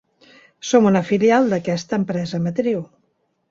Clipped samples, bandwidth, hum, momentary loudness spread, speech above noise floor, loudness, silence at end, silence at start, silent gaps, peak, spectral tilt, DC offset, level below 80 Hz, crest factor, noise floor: under 0.1%; 7.8 kHz; none; 8 LU; 49 dB; -19 LUFS; 0.65 s; 0.65 s; none; -2 dBFS; -6 dB/octave; under 0.1%; -60 dBFS; 18 dB; -67 dBFS